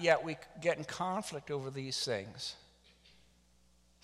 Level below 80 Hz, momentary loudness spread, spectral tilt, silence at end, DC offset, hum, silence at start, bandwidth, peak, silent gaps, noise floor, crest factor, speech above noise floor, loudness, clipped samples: -70 dBFS; 10 LU; -3.5 dB/octave; 1.45 s; under 0.1%; none; 0 s; 14 kHz; -12 dBFS; none; -68 dBFS; 26 dB; 33 dB; -37 LUFS; under 0.1%